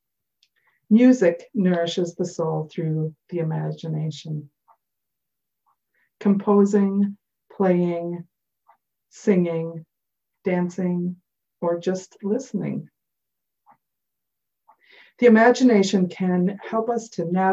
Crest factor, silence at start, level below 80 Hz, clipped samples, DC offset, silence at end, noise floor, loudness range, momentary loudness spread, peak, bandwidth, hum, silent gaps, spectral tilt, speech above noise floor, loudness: 18 dB; 0.9 s; -72 dBFS; under 0.1%; under 0.1%; 0 s; -84 dBFS; 10 LU; 14 LU; -4 dBFS; 8 kHz; none; none; -7 dB/octave; 63 dB; -22 LUFS